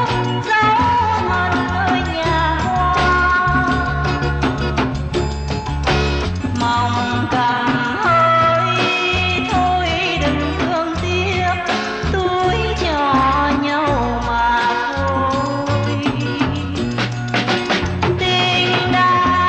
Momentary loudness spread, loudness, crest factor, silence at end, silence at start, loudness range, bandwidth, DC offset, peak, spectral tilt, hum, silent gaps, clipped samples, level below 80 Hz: 6 LU; -17 LUFS; 12 dB; 0 s; 0 s; 3 LU; 9 kHz; under 0.1%; -4 dBFS; -5.5 dB/octave; none; none; under 0.1%; -30 dBFS